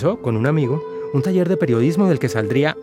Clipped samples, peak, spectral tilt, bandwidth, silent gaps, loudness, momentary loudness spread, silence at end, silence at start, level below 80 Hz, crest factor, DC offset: under 0.1%; -2 dBFS; -7.5 dB/octave; 15.5 kHz; none; -19 LUFS; 5 LU; 0 s; 0 s; -58 dBFS; 16 dB; under 0.1%